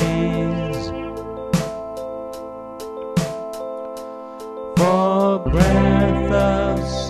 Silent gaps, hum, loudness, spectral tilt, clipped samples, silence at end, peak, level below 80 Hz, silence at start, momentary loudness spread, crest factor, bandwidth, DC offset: none; none; -20 LUFS; -6.5 dB/octave; under 0.1%; 0 s; -2 dBFS; -32 dBFS; 0 s; 16 LU; 18 dB; 14 kHz; under 0.1%